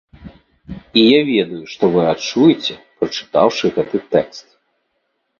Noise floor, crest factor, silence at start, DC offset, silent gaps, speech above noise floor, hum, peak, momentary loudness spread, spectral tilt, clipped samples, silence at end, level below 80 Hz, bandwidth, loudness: -69 dBFS; 18 dB; 0.25 s; under 0.1%; none; 54 dB; none; 0 dBFS; 13 LU; -5.5 dB/octave; under 0.1%; 1 s; -50 dBFS; 7 kHz; -16 LUFS